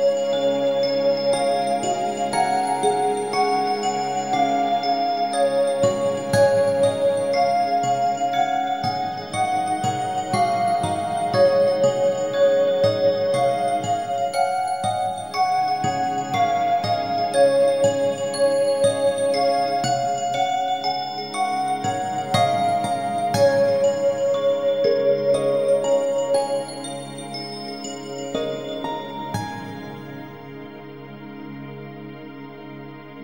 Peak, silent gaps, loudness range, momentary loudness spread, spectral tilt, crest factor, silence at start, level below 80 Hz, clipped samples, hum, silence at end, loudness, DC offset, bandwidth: -6 dBFS; none; 10 LU; 15 LU; -4.5 dB/octave; 16 dB; 0 s; -60 dBFS; under 0.1%; none; 0 s; -21 LUFS; 0.2%; 16 kHz